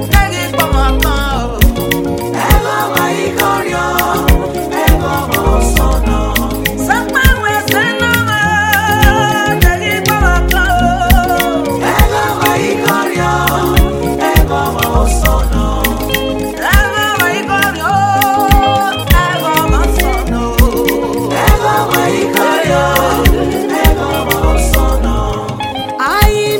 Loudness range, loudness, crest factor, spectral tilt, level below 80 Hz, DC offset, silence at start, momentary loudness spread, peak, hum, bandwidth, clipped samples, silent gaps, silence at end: 2 LU; -12 LUFS; 12 dB; -4.5 dB/octave; -16 dBFS; under 0.1%; 0 s; 5 LU; 0 dBFS; none; 17.5 kHz; 0.2%; none; 0 s